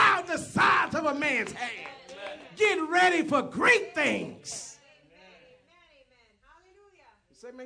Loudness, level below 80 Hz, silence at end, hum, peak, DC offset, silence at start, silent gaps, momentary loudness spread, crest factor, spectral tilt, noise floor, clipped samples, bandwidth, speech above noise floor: -25 LUFS; -68 dBFS; 0 s; none; -8 dBFS; under 0.1%; 0 s; none; 19 LU; 20 dB; -3.5 dB/octave; -63 dBFS; under 0.1%; 11 kHz; 36 dB